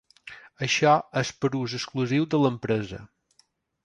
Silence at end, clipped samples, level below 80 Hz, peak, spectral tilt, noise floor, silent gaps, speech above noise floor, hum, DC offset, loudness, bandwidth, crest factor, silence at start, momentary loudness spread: 0.8 s; under 0.1%; -60 dBFS; -8 dBFS; -5 dB/octave; -66 dBFS; none; 41 dB; none; under 0.1%; -25 LUFS; 11.5 kHz; 20 dB; 0.25 s; 22 LU